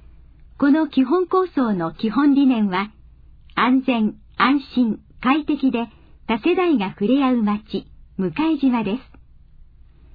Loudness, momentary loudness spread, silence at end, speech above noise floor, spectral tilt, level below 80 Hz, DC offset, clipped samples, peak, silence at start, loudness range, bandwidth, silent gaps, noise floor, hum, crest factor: -20 LUFS; 10 LU; 1.1 s; 28 dB; -9 dB/octave; -48 dBFS; under 0.1%; under 0.1%; -4 dBFS; 0.6 s; 2 LU; 5 kHz; none; -47 dBFS; none; 16 dB